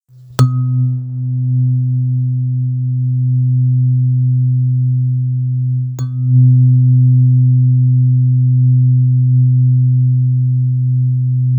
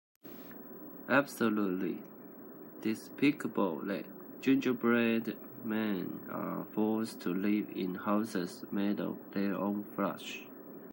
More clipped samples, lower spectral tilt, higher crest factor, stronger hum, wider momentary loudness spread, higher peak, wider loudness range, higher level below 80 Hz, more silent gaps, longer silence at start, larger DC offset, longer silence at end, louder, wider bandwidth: neither; first, -9.5 dB/octave vs -6 dB/octave; second, 12 dB vs 22 dB; neither; second, 7 LU vs 17 LU; first, 0 dBFS vs -12 dBFS; about the same, 5 LU vs 3 LU; first, -56 dBFS vs -84 dBFS; neither; about the same, 0.3 s vs 0.25 s; neither; about the same, 0 s vs 0 s; first, -13 LUFS vs -34 LUFS; second, 1.7 kHz vs 16 kHz